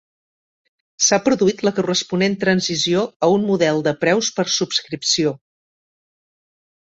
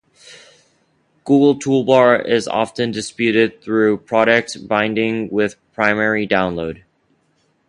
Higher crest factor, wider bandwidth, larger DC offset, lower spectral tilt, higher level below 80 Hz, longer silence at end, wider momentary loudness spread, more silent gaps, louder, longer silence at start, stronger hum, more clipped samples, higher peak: about the same, 18 dB vs 18 dB; second, 8 kHz vs 11 kHz; neither; second, -3.5 dB/octave vs -5.5 dB/octave; second, -60 dBFS vs -54 dBFS; first, 1.45 s vs 0.95 s; second, 4 LU vs 9 LU; first, 3.16-3.20 s vs none; about the same, -18 LUFS vs -17 LUFS; first, 1 s vs 0.3 s; neither; neither; about the same, -2 dBFS vs 0 dBFS